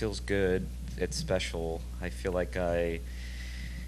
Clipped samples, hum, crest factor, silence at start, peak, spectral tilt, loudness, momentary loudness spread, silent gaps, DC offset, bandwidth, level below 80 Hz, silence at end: under 0.1%; 60 Hz at -40 dBFS; 18 dB; 0 s; -14 dBFS; -5 dB/octave; -33 LUFS; 11 LU; none; under 0.1%; 13 kHz; -40 dBFS; 0 s